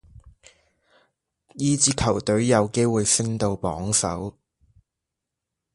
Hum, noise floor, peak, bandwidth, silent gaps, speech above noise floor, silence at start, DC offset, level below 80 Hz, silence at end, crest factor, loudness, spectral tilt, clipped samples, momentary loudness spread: none; -84 dBFS; -2 dBFS; 11.5 kHz; none; 62 dB; 1.55 s; under 0.1%; -46 dBFS; 1.45 s; 22 dB; -22 LUFS; -4 dB/octave; under 0.1%; 8 LU